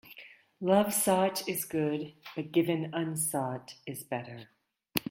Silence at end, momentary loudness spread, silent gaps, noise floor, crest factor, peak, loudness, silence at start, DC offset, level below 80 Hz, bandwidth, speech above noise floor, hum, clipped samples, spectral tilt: 0 s; 16 LU; none; -53 dBFS; 24 dB; -8 dBFS; -31 LUFS; 0.05 s; under 0.1%; -72 dBFS; 16.5 kHz; 23 dB; none; under 0.1%; -4.5 dB/octave